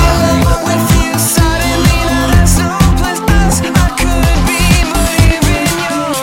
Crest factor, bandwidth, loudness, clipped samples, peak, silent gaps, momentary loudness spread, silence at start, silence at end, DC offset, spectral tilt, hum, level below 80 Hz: 10 dB; 17 kHz; -11 LUFS; under 0.1%; 0 dBFS; none; 3 LU; 0 s; 0 s; under 0.1%; -4.5 dB/octave; none; -14 dBFS